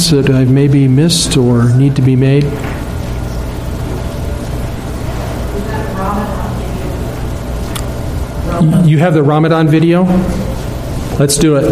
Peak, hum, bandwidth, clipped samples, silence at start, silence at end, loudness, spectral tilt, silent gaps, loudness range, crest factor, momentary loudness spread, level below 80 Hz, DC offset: 0 dBFS; none; 15.5 kHz; under 0.1%; 0 s; 0 s; -13 LUFS; -6 dB/octave; none; 8 LU; 12 dB; 11 LU; -24 dBFS; under 0.1%